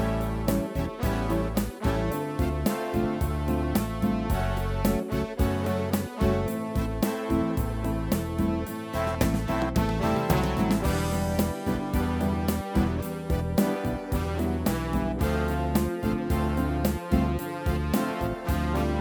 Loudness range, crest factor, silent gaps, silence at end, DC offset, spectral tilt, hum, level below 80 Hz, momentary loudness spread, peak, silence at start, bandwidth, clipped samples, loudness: 2 LU; 18 dB; none; 0 s; under 0.1%; -6.5 dB/octave; none; -34 dBFS; 4 LU; -8 dBFS; 0 s; over 20 kHz; under 0.1%; -28 LUFS